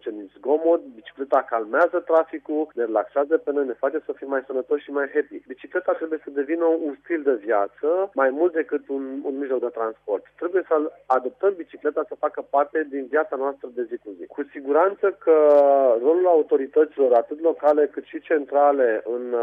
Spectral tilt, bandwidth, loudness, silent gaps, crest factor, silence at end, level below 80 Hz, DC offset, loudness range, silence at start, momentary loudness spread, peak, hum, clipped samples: -6.5 dB/octave; 3.8 kHz; -22 LUFS; none; 16 dB; 0 s; -74 dBFS; under 0.1%; 7 LU; 0.05 s; 11 LU; -6 dBFS; 50 Hz at -75 dBFS; under 0.1%